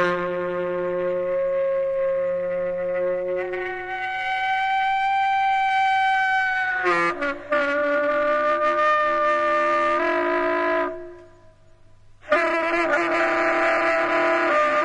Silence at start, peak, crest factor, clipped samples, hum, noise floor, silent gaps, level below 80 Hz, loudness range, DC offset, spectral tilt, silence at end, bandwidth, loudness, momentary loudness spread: 0 s; -6 dBFS; 16 dB; under 0.1%; none; -49 dBFS; none; -54 dBFS; 4 LU; under 0.1%; -4.5 dB/octave; 0 s; 10.5 kHz; -22 LUFS; 6 LU